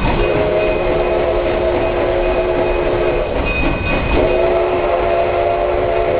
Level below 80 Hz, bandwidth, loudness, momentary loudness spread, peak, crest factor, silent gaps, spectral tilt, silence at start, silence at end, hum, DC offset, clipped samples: -24 dBFS; 4 kHz; -16 LUFS; 2 LU; -2 dBFS; 14 dB; none; -10.5 dB/octave; 0 s; 0 s; none; under 0.1%; under 0.1%